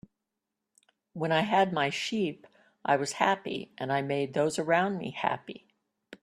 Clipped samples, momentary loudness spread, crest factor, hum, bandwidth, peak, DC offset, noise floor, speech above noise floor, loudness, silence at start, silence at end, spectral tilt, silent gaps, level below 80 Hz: under 0.1%; 12 LU; 24 dB; none; 13.5 kHz; -8 dBFS; under 0.1%; -86 dBFS; 57 dB; -29 LUFS; 1.15 s; 0.05 s; -4.5 dB/octave; none; -72 dBFS